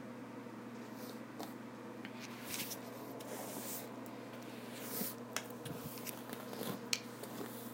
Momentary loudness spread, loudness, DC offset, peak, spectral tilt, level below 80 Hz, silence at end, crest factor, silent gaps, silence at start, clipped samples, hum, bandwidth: 9 LU; -45 LUFS; under 0.1%; -12 dBFS; -3 dB/octave; -82 dBFS; 0 s; 34 dB; none; 0 s; under 0.1%; none; 17 kHz